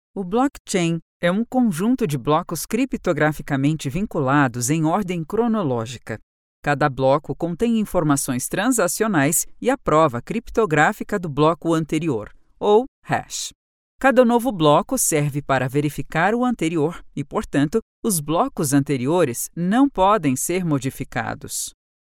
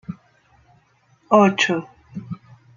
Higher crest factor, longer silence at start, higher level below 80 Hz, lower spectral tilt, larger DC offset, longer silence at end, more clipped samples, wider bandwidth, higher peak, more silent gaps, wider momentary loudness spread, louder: about the same, 20 dB vs 22 dB; about the same, 0.15 s vs 0.1 s; first, -46 dBFS vs -64 dBFS; about the same, -5 dB/octave vs -5 dB/octave; neither; about the same, 0.45 s vs 0.4 s; neither; first, 18 kHz vs 7.4 kHz; about the same, 0 dBFS vs -2 dBFS; first, 0.60-0.65 s, 1.02-1.20 s, 6.23-6.63 s, 12.88-13.02 s, 13.55-13.99 s, 17.82-18.03 s vs none; second, 9 LU vs 22 LU; second, -21 LUFS vs -17 LUFS